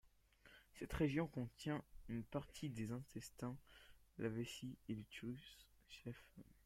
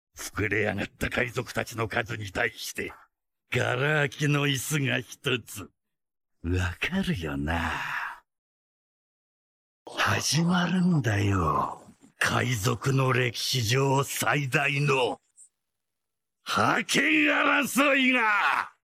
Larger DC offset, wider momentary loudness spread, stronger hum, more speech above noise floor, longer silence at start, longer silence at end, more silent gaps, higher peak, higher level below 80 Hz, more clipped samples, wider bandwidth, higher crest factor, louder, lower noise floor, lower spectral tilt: neither; first, 21 LU vs 11 LU; neither; second, 23 dB vs 61 dB; about the same, 0.05 s vs 0.15 s; about the same, 0.15 s vs 0.15 s; second, none vs 8.38-9.86 s; second, -28 dBFS vs -8 dBFS; second, -64 dBFS vs -50 dBFS; neither; about the same, 16.5 kHz vs 16 kHz; about the same, 22 dB vs 18 dB; second, -48 LUFS vs -26 LUFS; second, -70 dBFS vs -87 dBFS; first, -6 dB/octave vs -4.5 dB/octave